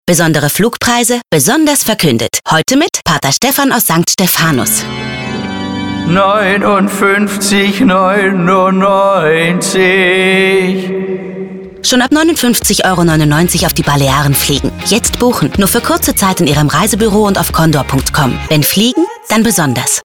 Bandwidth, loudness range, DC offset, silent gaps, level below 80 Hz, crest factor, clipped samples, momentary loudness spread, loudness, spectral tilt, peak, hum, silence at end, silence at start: 19.5 kHz; 2 LU; 0.3%; none; -32 dBFS; 10 dB; under 0.1%; 6 LU; -10 LUFS; -4 dB/octave; 0 dBFS; none; 0.05 s; 0.05 s